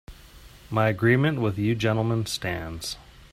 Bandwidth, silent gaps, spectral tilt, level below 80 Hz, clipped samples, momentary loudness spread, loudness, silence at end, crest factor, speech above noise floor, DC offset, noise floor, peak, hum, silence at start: 15.5 kHz; none; -6 dB/octave; -50 dBFS; under 0.1%; 12 LU; -25 LUFS; 0.05 s; 18 dB; 24 dB; under 0.1%; -48 dBFS; -6 dBFS; none; 0.1 s